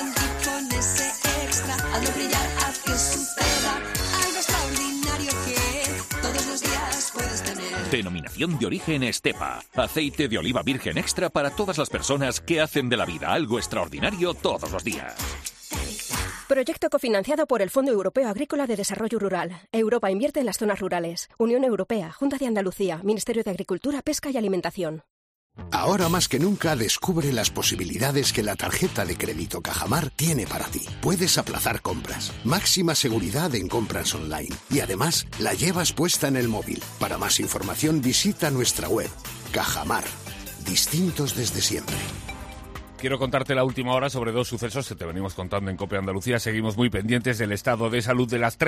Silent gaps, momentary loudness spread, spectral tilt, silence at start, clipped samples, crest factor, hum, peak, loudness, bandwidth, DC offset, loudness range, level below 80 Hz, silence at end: 25.10-25.50 s; 8 LU; -3.5 dB/octave; 0 s; under 0.1%; 18 dB; none; -6 dBFS; -25 LUFS; 15.5 kHz; under 0.1%; 3 LU; -42 dBFS; 0 s